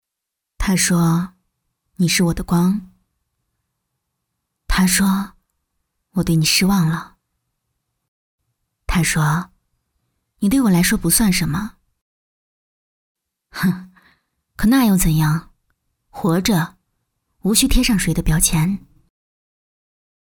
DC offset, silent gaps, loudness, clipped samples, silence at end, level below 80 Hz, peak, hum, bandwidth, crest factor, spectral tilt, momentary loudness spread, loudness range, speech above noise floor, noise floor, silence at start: under 0.1%; 8.08-8.38 s, 12.01-13.15 s; -17 LUFS; under 0.1%; 1.6 s; -32 dBFS; -2 dBFS; none; over 20 kHz; 18 dB; -4.5 dB/octave; 12 LU; 4 LU; 66 dB; -82 dBFS; 0.6 s